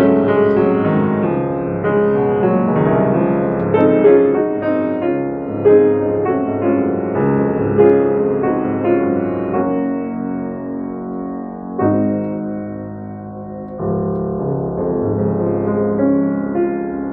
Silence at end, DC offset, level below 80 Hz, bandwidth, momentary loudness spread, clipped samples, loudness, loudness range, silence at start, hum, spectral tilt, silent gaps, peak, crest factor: 0 s; under 0.1%; -46 dBFS; 3.8 kHz; 13 LU; under 0.1%; -16 LUFS; 7 LU; 0 s; none; -9 dB/octave; none; 0 dBFS; 14 dB